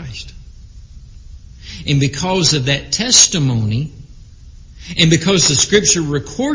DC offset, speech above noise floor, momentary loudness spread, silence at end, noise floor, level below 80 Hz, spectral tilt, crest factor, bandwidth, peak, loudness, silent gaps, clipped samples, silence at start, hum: under 0.1%; 24 dB; 17 LU; 0 s; -38 dBFS; -38 dBFS; -3 dB/octave; 16 dB; 8 kHz; 0 dBFS; -13 LUFS; none; under 0.1%; 0 s; none